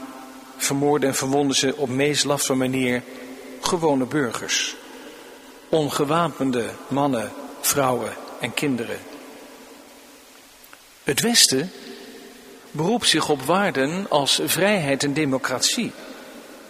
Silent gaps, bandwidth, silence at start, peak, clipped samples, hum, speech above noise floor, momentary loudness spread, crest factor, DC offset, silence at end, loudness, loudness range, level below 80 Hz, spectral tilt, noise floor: none; 15.5 kHz; 0 s; 0 dBFS; under 0.1%; none; 26 dB; 21 LU; 24 dB; under 0.1%; 0 s; -21 LUFS; 5 LU; -60 dBFS; -3 dB/octave; -48 dBFS